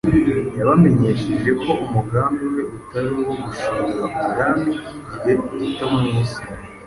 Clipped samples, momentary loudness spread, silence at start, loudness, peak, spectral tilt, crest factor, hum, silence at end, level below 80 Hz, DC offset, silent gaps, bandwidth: under 0.1%; 10 LU; 0.05 s; -20 LUFS; -2 dBFS; -7.5 dB/octave; 16 dB; none; 0 s; -42 dBFS; under 0.1%; none; 11.5 kHz